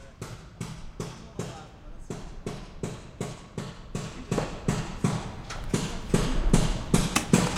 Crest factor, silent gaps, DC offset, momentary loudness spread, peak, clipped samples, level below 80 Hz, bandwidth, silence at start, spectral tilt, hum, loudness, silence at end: 24 dB; none; under 0.1%; 15 LU; -4 dBFS; under 0.1%; -36 dBFS; 16 kHz; 0 s; -5 dB/octave; none; -31 LUFS; 0 s